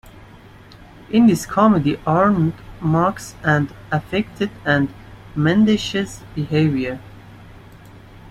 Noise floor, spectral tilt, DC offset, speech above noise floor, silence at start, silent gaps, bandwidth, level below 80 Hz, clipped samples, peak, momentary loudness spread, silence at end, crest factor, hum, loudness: -43 dBFS; -6.5 dB/octave; under 0.1%; 25 dB; 0.05 s; none; 14.5 kHz; -46 dBFS; under 0.1%; -2 dBFS; 11 LU; 0 s; 18 dB; none; -19 LUFS